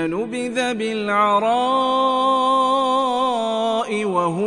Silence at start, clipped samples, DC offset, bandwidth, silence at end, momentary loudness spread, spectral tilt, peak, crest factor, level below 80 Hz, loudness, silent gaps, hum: 0 s; under 0.1%; under 0.1%; 11 kHz; 0 s; 5 LU; -4.5 dB/octave; -6 dBFS; 12 dB; -60 dBFS; -19 LUFS; none; none